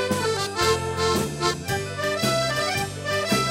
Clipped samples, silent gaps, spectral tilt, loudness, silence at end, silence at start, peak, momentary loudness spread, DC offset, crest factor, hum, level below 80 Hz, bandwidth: under 0.1%; none; -3.5 dB/octave; -24 LUFS; 0 s; 0 s; -4 dBFS; 4 LU; under 0.1%; 20 dB; none; -48 dBFS; 16 kHz